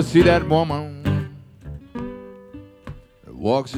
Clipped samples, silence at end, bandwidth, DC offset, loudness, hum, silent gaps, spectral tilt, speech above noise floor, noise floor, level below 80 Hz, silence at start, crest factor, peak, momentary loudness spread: under 0.1%; 0 s; 13 kHz; under 0.1%; -21 LUFS; none; none; -7 dB/octave; 24 dB; -42 dBFS; -40 dBFS; 0 s; 18 dB; -4 dBFS; 26 LU